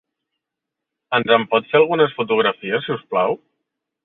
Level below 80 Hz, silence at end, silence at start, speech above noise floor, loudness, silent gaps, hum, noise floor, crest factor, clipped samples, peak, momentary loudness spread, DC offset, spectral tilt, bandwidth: -66 dBFS; 0.7 s; 1.1 s; 65 dB; -18 LUFS; none; none; -83 dBFS; 18 dB; under 0.1%; -2 dBFS; 7 LU; under 0.1%; -9 dB/octave; 4.1 kHz